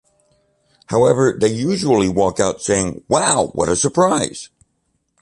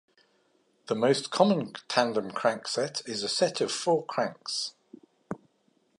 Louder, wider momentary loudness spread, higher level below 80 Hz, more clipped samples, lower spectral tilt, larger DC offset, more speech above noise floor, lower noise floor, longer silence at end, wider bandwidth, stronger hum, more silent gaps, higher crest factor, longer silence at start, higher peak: first, -17 LUFS vs -28 LUFS; second, 5 LU vs 11 LU; first, -46 dBFS vs -78 dBFS; neither; about the same, -4.5 dB/octave vs -4 dB/octave; neither; first, 52 dB vs 42 dB; about the same, -68 dBFS vs -69 dBFS; first, 0.75 s vs 0.6 s; about the same, 11.5 kHz vs 11.5 kHz; neither; neither; second, 16 dB vs 24 dB; about the same, 0.9 s vs 0.9 s; first, -2 dBFS vs -6 dBFS